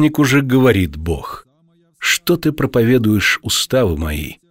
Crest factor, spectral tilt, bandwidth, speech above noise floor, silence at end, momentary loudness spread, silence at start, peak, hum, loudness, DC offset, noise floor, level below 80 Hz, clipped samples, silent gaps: 16 dB; -5 dB/octave; 16.5 kHz; 41 dB; 0.15 s; 11 LU; 0 s; 0 dBFS; none; -15 LUFS; under 0.1%; -56 dBFS; -34 dBFS; under 0.1%; none